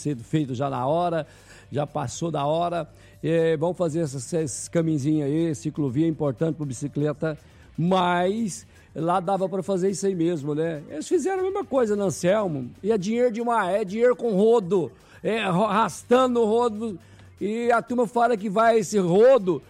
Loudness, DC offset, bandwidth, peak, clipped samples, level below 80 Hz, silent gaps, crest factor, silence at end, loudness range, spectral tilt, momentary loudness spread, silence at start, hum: -24 LUFS; under 0.1%; 13 kHz; -10 dBFS; under 0.1%; -58 dBFS; none; 14 dB; 0.1 s; 4 LU; -6 dB/octave; 10 LU; 0 s; none